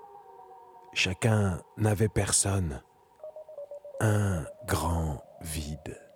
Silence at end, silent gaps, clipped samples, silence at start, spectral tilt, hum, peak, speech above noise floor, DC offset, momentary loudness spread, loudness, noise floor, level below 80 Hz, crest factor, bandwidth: 0.15 s; none; under 0.1%; 0 s; -4.5 dB/octave; none; -10 dBFS; 23 dB; under 0.1%; 20 LU; -29 LUFS; -51 dBFS; -46 dBFS; 20 dB; 16.5 kHz